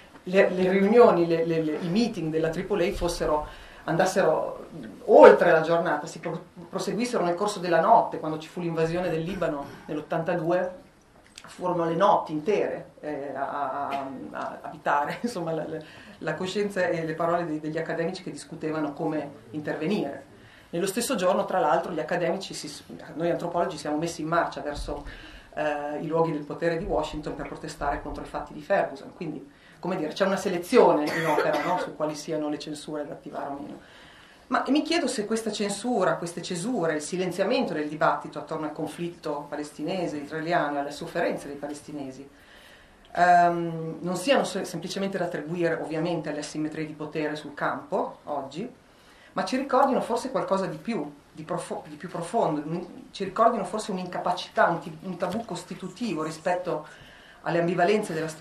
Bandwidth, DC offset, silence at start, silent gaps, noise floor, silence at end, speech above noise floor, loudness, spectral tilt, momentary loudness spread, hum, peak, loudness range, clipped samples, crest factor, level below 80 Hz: 14 kHz; under 0.1%; 0 s; none; -55 dBFS; 0 s; 29 dB; -26 LUFS; -5.5 dB/octave; 14 LU; none; 0 dBFS; 9 LU; under 0.1%; 26 dB; -54 dBFS